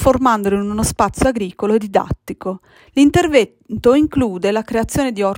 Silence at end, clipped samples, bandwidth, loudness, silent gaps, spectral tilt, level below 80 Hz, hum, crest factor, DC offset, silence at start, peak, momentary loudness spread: 0 s; under 0.1%; 16.5 kHz; -17 LUFS; none; -5.5 dB/octave; -36 dBFS; none; 16 dB; under 0.1%; 0 s; 0 dBFS; 11 LU